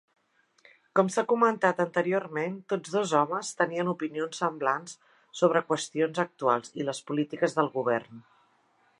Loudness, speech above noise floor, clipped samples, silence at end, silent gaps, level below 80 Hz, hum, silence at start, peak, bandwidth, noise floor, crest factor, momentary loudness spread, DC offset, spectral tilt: -28 LUFS; 39 dB; under 0.1%; 0.8 s; none; -82 dBFS; none; 0.95 s; -8 dBFS; 11.5 kHz; -67 dBFS; 22 dB; 8 LU; under 0.1%; -5 dB/octave